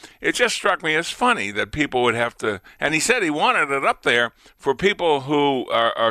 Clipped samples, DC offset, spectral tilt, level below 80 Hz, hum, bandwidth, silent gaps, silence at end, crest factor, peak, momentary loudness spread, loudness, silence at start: under 0.1%; under 0.1%; -3 dB/octave; -52 dBFS; none; 15 kHz; none; 0 s; 16 dB; -4 dBFS; 7 LU; -20 LUFS; 0.05 s